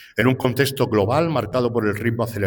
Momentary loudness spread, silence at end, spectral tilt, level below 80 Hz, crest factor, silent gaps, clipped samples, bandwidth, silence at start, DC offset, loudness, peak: 4 LU; 0 s; -6 dB/octave; -52 dBFS; 16 dB; none; under 0.1%; 19 kHz; 0 s; under 0.1%; -20 LUFS; -4 dBFS